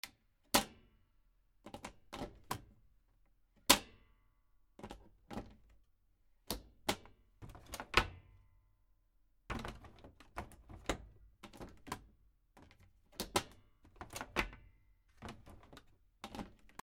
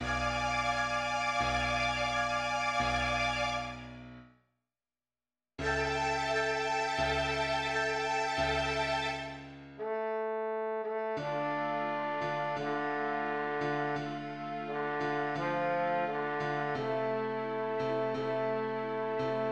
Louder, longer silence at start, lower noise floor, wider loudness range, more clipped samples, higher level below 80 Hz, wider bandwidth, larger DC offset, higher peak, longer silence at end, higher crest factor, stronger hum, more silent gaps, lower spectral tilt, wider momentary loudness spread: second, -39 LUFS vs -33 LUFS; about the same, 0.05 s vs 0 s; second, -73 dBFS vs under -90 dBFS; first, 11 LU vs 4 LU; neither; second, -58 dBFS vs -52 dBFS; first, 19 kHz vs 12 kHz; neither; first, -6 dBFS vs -18 dBFS; first, 0.3 s vs 0 s; first, 38 dB vs 16 dB; neither; neither; second, -2 dB/octave vs -4 dB/octave; first, 25 LU vs 7 LU